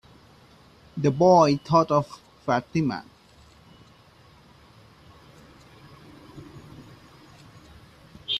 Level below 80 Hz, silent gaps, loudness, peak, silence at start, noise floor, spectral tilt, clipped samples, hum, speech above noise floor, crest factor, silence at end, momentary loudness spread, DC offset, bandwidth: -60 dBFS; none; -22 LUFS; -6 dBFS; 0.95 s; -54 dBFS; -6.5 dB/octave; under 0.1%; none; 33 dB; 22 dB; 0 s; 28 LU; under 0.1%; 12.5 kHz